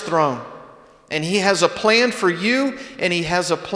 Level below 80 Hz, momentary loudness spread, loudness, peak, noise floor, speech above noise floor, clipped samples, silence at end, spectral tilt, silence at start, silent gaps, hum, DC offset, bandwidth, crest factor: -54 dBFS; 9 LU; -19 LUFS; -2 dBFS; -45 dBFS; 26 dB; under 0.1%; 0 s; -4 dB/octave; 0 s; none; none; under 0.1%; 11 kHz; 18 dB